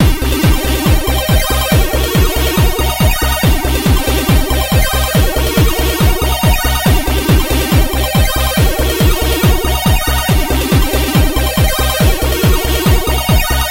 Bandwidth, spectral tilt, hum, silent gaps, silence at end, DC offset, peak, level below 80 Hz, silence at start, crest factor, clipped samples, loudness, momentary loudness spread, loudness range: 16.5 kHz; -4.5 dB/octave; none; none; 0 s; under 0.1%; 0 dBFS; -14 dBFS; 0 s; 12 dB; under 0.1%; -13 LUFS; 1 LU; 0 LU